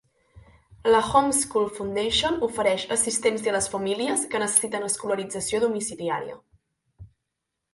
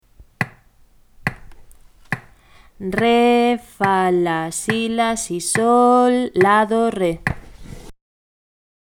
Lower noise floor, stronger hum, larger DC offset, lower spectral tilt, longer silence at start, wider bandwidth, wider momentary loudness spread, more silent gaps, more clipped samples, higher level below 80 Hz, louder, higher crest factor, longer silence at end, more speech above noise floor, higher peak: first, -82 dBFS vs -51 dBFS; neither; neither; second, -2 dB/octave vs -4.5 dB/octave; first, 0.35 s vs 0.2 s; second, 12 kHz vs 17 kHz; second, 8 LU vs 13 LU; neither; neither; second, -54 dBFS vs -46 dBFS; second, -24 LUFS vs -18 LUFS; about the same, 22 dB vs 20 dB; second, 0.65 s vs 1.05 s; first, 58 dB vs 35 dB; second, -4 dBFS vs 0 dBFS